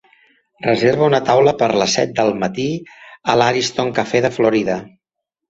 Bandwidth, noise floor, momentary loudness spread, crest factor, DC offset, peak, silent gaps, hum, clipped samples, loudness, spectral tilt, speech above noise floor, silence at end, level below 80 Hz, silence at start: 8 kHz; -81 dBFS; 9 LU; 16 dB; under 0.1%; 0 dBFS; none; none; under 0.1%; -16 LUFS; -4.5 dB/octave; 65 dB; 0.6 s; -54 dBFS; 0.6 s